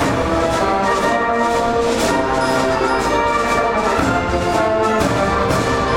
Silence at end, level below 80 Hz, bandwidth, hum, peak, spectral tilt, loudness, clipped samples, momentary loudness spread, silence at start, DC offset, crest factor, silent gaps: 0 s; -32 dBFS; 16.5 kHz; none; -4 dBFS; -5 dB/octave; -16 LUFS; under 0.1%; 1 LU; 0 s; under 0.1%; 14 dB; none